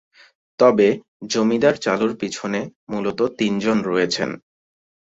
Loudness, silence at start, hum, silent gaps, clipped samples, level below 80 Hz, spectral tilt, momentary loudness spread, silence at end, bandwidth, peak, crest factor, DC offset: -20 LUFS; 0.6 s; none; 1.08-1.20 s, 2.76-2.87 s; under 0.1%; -60 dBFS; -5 dB/octave; 11 LU; 0.75 s; 8 kHz; -2 dBFS; 18 dB; under 0.1%